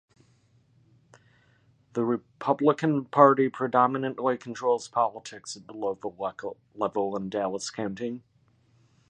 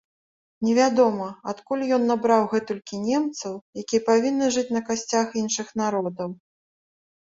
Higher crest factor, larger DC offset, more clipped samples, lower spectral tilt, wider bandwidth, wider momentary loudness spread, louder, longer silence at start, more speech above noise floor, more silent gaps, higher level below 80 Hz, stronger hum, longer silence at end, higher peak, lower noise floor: first, 24 dB vs 18 dB; neither; neither; first, -6 dB/octave vs -4 dB/octave; first, 10 kHz vs 7.8 kHz; first, 17 LU vs 12 LU; second, -27 LUFS vs -24 LUFS; first, 1.95 s vs 0.6 s; second, 38 dB vs over 67 dB; second, none vs 3.61-3.73 s; second, -72 dBFS vs -66 dBFS; neither; about the same, 0.9 s vs 0.95 s; about the same, -4 dBFS vs -6 dBFS; second, -64 dBFS vs under -90 dBFS